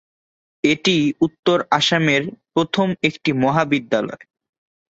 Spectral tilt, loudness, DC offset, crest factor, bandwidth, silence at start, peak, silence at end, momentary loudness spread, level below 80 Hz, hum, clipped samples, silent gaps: -5 dB/octave; -19 LUFS; under 0.1%; 18 dB; 8 kHz; 0.65 s; -2 dBFS; 0.8 s; 6 LU; -58 dBFS; none; under 0.1%; 1.39-1.43 s